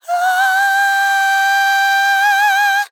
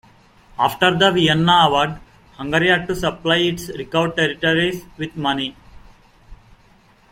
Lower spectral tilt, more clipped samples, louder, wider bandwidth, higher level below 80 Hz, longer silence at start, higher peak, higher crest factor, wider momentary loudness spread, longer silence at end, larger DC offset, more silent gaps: second, 8.5 dB/octave vs -5 dB/octave; neither; first, -13 LUFS vs -18 LUFS; first, 19.5 kHz vs 16.5 kHz; second, under -90 dBFS vs -46 dBFS; second, 0.05 s vs 0.6 s; about the same, -4 dBFS vs -2 dBFS; second, 10 dB vs 18 dB; second, 2 LU vs 15 LU; second, 0.05 s vs 0.8 s; neither; neither